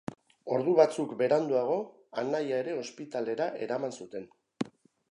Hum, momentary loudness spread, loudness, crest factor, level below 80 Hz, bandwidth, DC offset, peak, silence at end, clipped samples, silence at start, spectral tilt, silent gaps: none; 15 LU; -30 LUFS; 22 dB; -78 dBFS; 11 kHz; under 0.1%; -8 dBFS; 0.4 s; under 0.1%; 0.1 s; -6 dB/octave; none